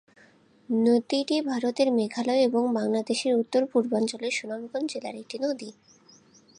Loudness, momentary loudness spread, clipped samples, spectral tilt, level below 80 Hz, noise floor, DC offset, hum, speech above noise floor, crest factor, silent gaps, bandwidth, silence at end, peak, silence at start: -26 LUFS; 9 LU; under 0.1%; -4.5 dB/octave; -78 dBFS; -58 dBFS; under 0.1%; none; 32 dB; 16 dB; none; 10.5 kHz; 0.85 s; -10 dBFS; 0.7 s